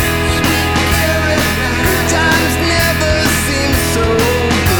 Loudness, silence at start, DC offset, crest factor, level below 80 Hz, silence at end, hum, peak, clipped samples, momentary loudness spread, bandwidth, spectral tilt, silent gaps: -13 LUFS; 0 s; under 0.1%; 12 dB; -22 dBFS; 0 s; none; 0 dBFS; under 0.1%; 2 LU; over 20 kHz; -4 dB/octave; none